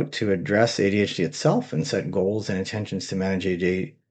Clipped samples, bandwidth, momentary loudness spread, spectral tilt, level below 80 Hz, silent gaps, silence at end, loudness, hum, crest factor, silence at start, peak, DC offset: under 0.1%; 9 kHz; 7 LU; -5.5 dB/octave; -62 dBFS; none; 0.2 s; -24 LUFS; none; 20 dB; 0 s; -4 dBFS; under 0.1%